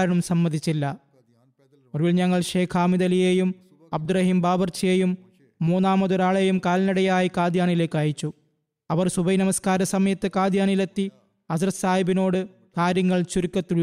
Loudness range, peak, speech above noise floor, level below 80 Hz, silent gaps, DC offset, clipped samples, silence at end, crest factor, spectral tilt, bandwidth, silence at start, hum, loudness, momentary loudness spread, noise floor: 2 LU; -12 dBFS; 48 dB; -56 dBFS; none; under 0.1%; under 0.1%; 0 s; 10 dB; -6 dB/octave; 13.5 kHz; 0 s; none; -23 LUFS; 9 LU; -70 dBFS